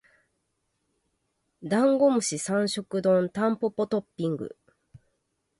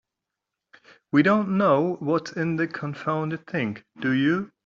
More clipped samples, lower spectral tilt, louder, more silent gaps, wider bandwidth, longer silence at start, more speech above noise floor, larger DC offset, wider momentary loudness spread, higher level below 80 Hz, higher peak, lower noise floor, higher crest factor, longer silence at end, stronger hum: neither; about the same, -5 dB/octave vs -5.5 dB/octave; about the same, -26 LUFS vs -24 LUFS; neither; first, 11.5 kHz vs 7.4 kHz; first, 1.6 s vs 1.15 s; second, 52 dB vs 62 dB; neither; about the same, 10 LU vs 9 LU; about the same, -70 dBFS vs -66 dBFS; second, -12 dBFS vs -6 dBFS; second, -77 dBFS vs -85 dBFS; about the same, 16 dB vs 20 dB; first, 0.65 s vs 0.2 s; neither